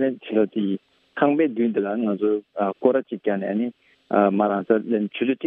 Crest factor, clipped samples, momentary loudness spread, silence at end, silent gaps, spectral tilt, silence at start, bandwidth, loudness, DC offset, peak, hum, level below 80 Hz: 18 dB; under 0.1%; 7 LU; 0 s; none; -10 dB/octave; 0 s; 4 kHz; -23 LUFS; under 0.1%; -4 dBFS; none; -74 dBFS